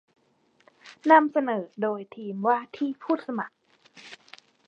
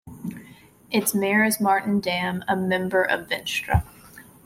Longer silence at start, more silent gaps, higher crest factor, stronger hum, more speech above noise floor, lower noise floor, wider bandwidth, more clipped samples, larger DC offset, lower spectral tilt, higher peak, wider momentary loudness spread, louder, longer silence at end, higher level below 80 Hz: first, 0.85 s vs 0.05 s; neither; first, 24 dB vs 18 dB; neither; first, 41 dB vs 27 dB; first, -66 dBFS vs -49 dBFS; second, 8 kHz vs 16.5 kHz; neither; neither; first, -6.5 dB/octave vs -4.5 dB/octave; about the same, -4 dBFS vs -6 dBFS; first, 26 LU vs 16 LU; about the same, -25 LUFS vs -23 LUFS; first, 0.55 s vs 0.25 s; second, -84 dBFS vs -42 dBFS